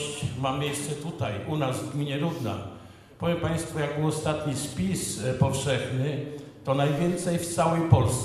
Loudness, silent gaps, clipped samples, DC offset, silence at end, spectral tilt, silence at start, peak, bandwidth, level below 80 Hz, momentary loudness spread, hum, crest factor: -28 LUFS; none; under 0.1%; under 0.1%; 0 s; -5.5 dB/octave; 0 s; -4 dBFS; 14 kHz; -50 dBFS; 8 LU; none; 24 dB